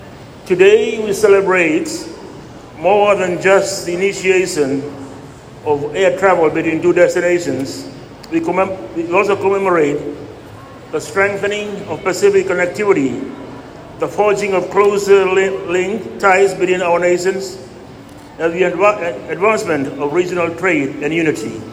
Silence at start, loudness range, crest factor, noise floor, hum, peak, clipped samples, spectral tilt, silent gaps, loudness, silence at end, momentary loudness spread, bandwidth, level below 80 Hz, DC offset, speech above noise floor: 0 s; 3 LU; 16 dB; -36 dBFS; none; 0 dBFS; under 0.1%; -5 dB/octave; none; -15 LUFS; 0 s; 20 LU; 15 kHz; -50 dBFS; under 0.1%; 21 dB